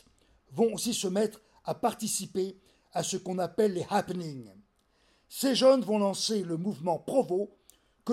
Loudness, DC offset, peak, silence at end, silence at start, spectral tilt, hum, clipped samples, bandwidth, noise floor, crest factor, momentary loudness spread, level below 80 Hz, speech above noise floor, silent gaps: -29 LUFS; under 0.1%; -12 dBFS; 0 s; 0.5 s; -4.5 dB/octave; none; under 0.1%; 16.5 kHz; -68 dBFS; 20 dB; 15 LU; -70 dBFS; 40 dB; none